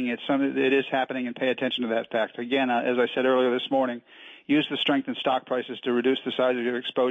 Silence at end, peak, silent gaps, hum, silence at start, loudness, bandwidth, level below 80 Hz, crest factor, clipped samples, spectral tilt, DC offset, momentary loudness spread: 0 s; -12 dBFS; none; none; 0 s; -25 LUFS; 7.6 kHz; -76 dBFS; 12 dB; under 0.1%; -6.5 dB/octave; under 0.1%; 6 LU